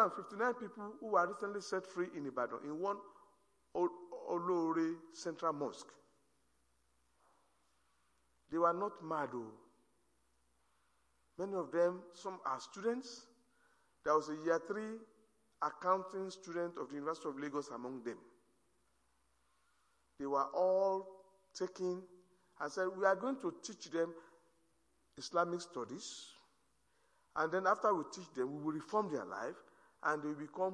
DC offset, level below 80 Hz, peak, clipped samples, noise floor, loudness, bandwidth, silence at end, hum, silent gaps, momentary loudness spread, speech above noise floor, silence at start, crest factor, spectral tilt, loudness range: under 0.1%; -84 dBFS; -18 dBFS; under 0.1%; -78 dBFS; -39 LUFS; 11 kHz; 0 s; none; none; 14 LU; 40 dB; 0 s; 22 dB; -5 dB/octave; 6 LU